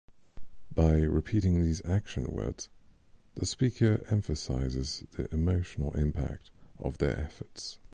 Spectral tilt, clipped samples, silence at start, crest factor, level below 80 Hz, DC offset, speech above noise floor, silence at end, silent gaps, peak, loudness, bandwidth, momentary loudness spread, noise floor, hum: -6.5 dB/octave; under 0.1%; 0.1 s; 18 dB; -38 dBFS; under 0.1%; 28 dB; 0.05 s; none; -12 dBFS; -31 LUFS; 9.8 kHz; 14 LU; -58 dBFS; none